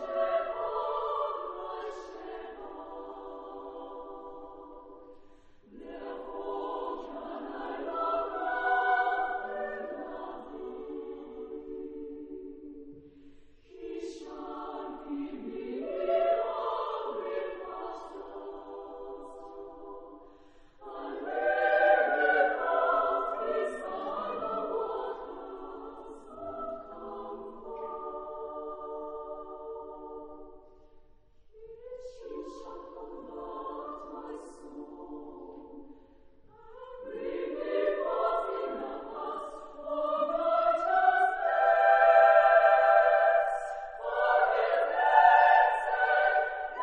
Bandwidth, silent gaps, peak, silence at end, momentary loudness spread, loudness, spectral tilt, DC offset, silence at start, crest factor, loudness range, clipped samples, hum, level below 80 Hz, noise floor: 9.2 kHz; none; -8 dBFS; 0 s; 22 LU; -29 LUFS; -4.5 dB/octave; under 0.1%; 0 s; 22 dB; 21 LU; under 0.1%; none; -62 dBFS; -57 dBFS